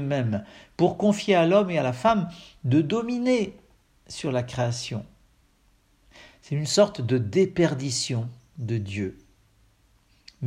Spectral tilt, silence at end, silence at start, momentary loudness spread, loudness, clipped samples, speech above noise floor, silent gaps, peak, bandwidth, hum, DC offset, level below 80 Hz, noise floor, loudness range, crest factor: -5.5 dB/octave; 0 s; 0 s; 13 LU; -25 LUFS; under 0.1%; 38 dB; none; -6 dBFS; 13 kHz; none; under 0.1%; -58 dBFS; -62 dBFS; 7 LU; 20 dB